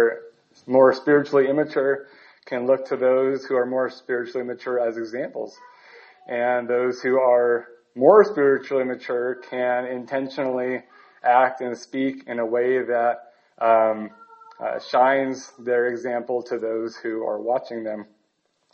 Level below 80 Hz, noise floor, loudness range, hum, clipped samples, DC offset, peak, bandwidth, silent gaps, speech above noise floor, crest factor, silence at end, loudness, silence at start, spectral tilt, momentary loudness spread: -76 dBFS; -70 dBFS; 6 LU; none; under 0.1%; under 0.1%; -2 dBFS; 7 kHz; none; 49 dB; 20 dB; 0.7 s; -22 LUFS; 0 s; -6 dB/octave; 13 LU